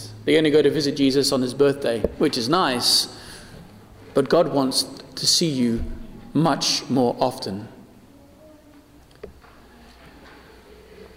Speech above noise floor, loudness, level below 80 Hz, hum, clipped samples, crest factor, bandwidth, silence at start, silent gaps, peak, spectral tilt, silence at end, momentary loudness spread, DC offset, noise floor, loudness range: 29 dB; -20 LUFS; -44 dBFS; none; under 0.1%; 18 dB; 16 kHz; 0 s; none; -6 dBFS; -4 dB/octave; 0.1 s; 14 LU; under 0.1%; -50 dBFS; 8 LU